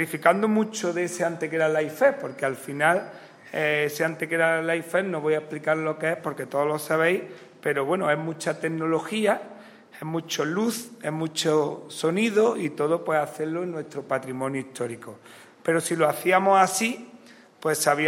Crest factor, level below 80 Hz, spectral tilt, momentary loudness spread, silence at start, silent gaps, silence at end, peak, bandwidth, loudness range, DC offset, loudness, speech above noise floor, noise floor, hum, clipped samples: 20 dB; -76 dBFS; -4.5 dB/octave; 11 LU; 0 s; none; 0 s; -4 dBFS; 16 kHz; 3 LU; under 0.1%; -25 LUFS; 25 dB; -50 dBFS; none; under 0.1%